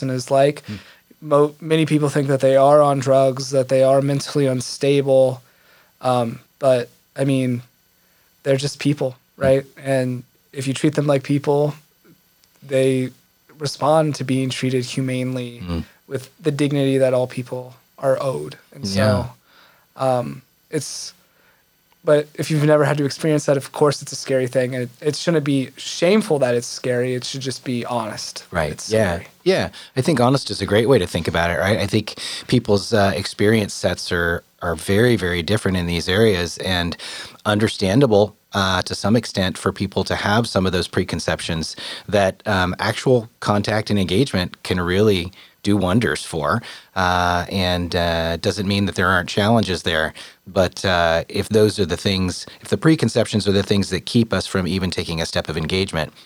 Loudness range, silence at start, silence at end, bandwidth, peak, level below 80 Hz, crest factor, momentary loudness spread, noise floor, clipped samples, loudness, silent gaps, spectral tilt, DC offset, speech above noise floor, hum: 5 LU; 0 s; 0.15 s; over 20 kHz; -2 dBFS; -50 dBFS; 18 dB; 10 LU; -59 dBFS; under 0.1%; -20 LUFS; none; -5.5 dB/octave; under 0.1%; 40 dB; none